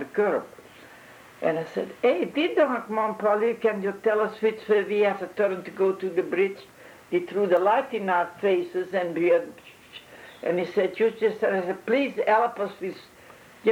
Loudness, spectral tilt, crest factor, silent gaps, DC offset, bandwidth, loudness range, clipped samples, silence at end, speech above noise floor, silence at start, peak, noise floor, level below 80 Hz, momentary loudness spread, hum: -25 LUFS; -6 dB/octave; 16 dB; none; under 0.1%; 16.5 kHz; 2 LU; under 0.1%; 0 s; 25 dB; 0 s; -10 dBFS; -50 dBFS; -74 dBFS; 10 LU; none